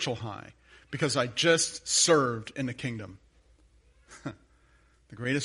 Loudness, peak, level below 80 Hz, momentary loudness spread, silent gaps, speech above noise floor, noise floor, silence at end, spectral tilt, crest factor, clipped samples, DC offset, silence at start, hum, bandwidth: -27 LUFS; -8 dBFS; -62 dBFS; 20 LU; none; 34 dB; -63 dBFS; 0 s; -3 dB/octave; 22 dB; under 0.1%; under 0.1%; 0 s; none; 11.5 kHz